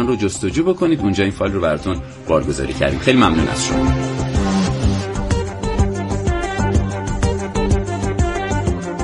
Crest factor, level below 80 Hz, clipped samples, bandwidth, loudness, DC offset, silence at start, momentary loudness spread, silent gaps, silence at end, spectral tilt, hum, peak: 16 dB; -26 dBFS; under 0.1%; 11.5 kHz; -18 LUFS; under 0.1%; 0 s; 6 LU; none; 0 s; -6 dB/octave; none; -2 dBFS